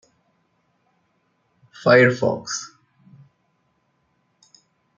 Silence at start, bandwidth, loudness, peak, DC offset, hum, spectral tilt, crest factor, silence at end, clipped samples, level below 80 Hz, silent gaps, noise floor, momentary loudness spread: 1.85 s; 7.6 kHz; -18 LUFS; 0 dBFS; under 0.1%; none; -5 dB/octave; 24 dB; 2.3 s; under 0.1%; -68 dBFS; none; -68 dBFS; 15 LU